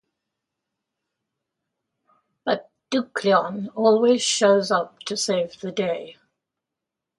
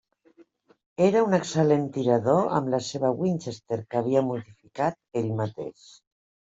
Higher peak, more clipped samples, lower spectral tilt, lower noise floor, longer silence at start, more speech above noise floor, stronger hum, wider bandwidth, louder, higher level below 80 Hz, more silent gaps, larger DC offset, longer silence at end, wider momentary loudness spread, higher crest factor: about the same, -6 dBFS vs -8 dBFS; neither; second, -3.5 dB/octave vs -6.5 dB/octave; first, -85 dBFS vs -58 dBFS; first, 2.45 s vs 1 s; first, 64 dB vs 33 dB; neither; first, 11.5 kHz vs 8 kHz; first, -22 LUFS vs -25 LUFS; second, -72 dBFS vs -66 dBFS; neither; neither; first, 1.1 s vs 0.8 s; about the same, 11 LU vs 11 LU; about the same, 20 dB vs 18 dB